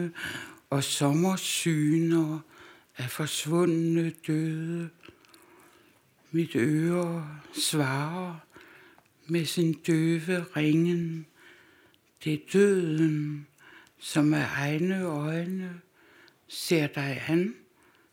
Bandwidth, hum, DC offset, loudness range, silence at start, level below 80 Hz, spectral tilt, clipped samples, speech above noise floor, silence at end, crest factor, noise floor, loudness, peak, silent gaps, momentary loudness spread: 17 kHz; none; under 0.1%; 3 LU; 0 s; -74 dBFS; -5.5 dB/octave; under 0.1%; 35 dB; 0.55 s; 18 dB; -62 dBFS; -28 LUFS; -10 dBFS; none; 12 LU